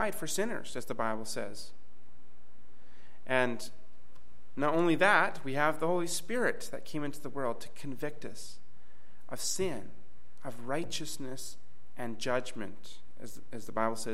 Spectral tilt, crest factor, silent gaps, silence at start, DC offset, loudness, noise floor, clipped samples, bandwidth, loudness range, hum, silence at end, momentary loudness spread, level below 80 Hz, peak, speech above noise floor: -3.5 dB/octave; 24 dB; none; 0 s; 3%; -33 LUFS; -64 dBFS; under 0.1%; 16.5 kHz; 9 LU; none; 0 s; 19 LU; -66 dBFS; -12 dBFS; 30 dB